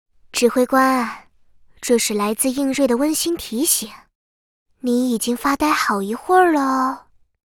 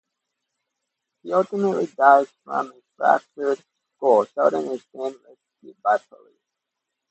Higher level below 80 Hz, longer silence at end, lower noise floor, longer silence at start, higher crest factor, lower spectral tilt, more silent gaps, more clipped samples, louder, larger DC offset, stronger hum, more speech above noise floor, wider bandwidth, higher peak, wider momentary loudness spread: first, -54 dBFS vs -80 dBFS; second, 0.55 s vs 1.15 s; second, -50 dBFS vs -83 dBFS; second, 0.35 s vs 1.25 s; second, 16 dB vs 22 dB; second, -2.5 dB/octave vs -6.5 dB/octave; first, 4.15-4.66 s vs none; neither; first, -18 LUFS vs -22 LUFS; neither; neither; second, 32 dB vs 61 dB; first, over 20 kHz vs 8.4 kHz; about the same, -2 dBFS vs 0 dBFS; second, 10 LU vs 15 LU